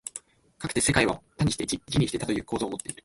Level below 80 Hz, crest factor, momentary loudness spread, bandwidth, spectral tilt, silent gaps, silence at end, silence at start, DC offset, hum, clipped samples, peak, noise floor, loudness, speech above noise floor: -48 dBFS; 22 dB; 12 LU; 12 kHz; -4 dB/octave; none; 0.1 s; 0.05 s; under 0.1%; none; under 0.1%; -6 dBFS; -47 dBFS; -27 LUFS; 20 dB